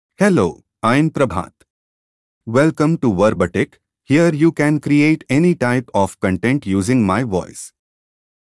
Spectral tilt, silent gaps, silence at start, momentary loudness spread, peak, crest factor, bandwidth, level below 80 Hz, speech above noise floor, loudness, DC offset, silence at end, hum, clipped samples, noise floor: -7 dB/octave; 1.70-2.41 s; 0.2 s; 9 LU; -2 dBFS; 14 dB; 12 kHz; -52 dBFS; over 74 dB; -17 LUFS; under 0.1%; 0.85 s; none; under 0.1%; under -90 dBFS